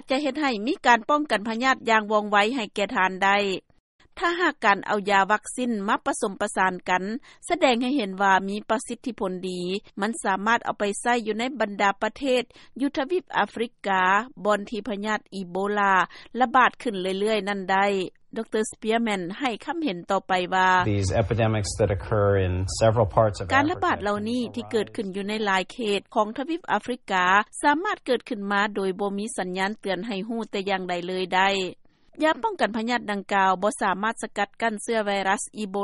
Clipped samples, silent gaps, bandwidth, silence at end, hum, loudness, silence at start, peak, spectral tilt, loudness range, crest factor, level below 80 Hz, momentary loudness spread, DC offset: under 0.1%; 3.80-3.99 s; 11.5 kHz; 0 s; none; -24 LUFS; 0.05 s; -4 dBFS; -4.5 dB/octave; 3 LU; 20 dB; -52 dBFS; 9 LU; under 0.1%